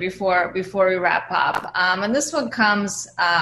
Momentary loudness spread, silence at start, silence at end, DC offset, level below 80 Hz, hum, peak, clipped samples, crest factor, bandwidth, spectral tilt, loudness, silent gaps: 4 LU; 0 s; 0 s; under 0.1%; -58 dBFS; none; -4 dBFS; under 0.1%; 16 dB; 12.5 kHz; -3 dB/octave; -20 LUFS; none